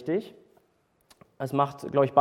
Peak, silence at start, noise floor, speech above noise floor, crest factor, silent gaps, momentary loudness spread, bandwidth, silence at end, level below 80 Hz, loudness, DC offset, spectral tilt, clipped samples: -6 dBFS; 0 s; -68 dBFS; 43 dB; 22 dB; none; 13 LU; 15.5 kHz; 0 s; -72 dBFS; -28 LUFS; under 0.1%; -7.5 dB/octave; under 0.1%